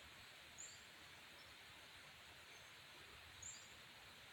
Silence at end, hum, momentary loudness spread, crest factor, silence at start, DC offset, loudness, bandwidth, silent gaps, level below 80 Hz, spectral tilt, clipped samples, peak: 0 s; none; 5 LU; 18 dB; 0 s; under 0.1%; -58 LUFS; 17 kHz; none; -78 dBFS; -1 dB/octave; under 0.1%; -42 dBFS